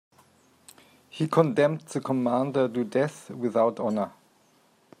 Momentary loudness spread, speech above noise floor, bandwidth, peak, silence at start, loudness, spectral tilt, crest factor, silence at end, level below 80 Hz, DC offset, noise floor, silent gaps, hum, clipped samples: 9 LU; 37 dB; 15 kHz; -6 dBFS; 1.15 s; -26 LUFS; -7 dB/octave; 22 dB; 0.9 s; -76 dBFS; under 0.1%; -63 dBFS; none; none; under 0.1%